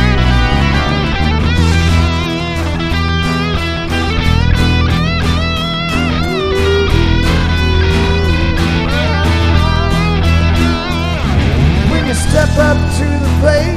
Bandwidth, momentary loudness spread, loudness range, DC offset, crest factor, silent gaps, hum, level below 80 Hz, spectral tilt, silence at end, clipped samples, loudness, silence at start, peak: 13 kHz; 4 LU; 1 LU; under 0.1%; 12 dB; none; none; -16 dBFS; -6 dB/octave; 0 s; under 0.1%; -13 LUFS; 0 s; 0 dBFS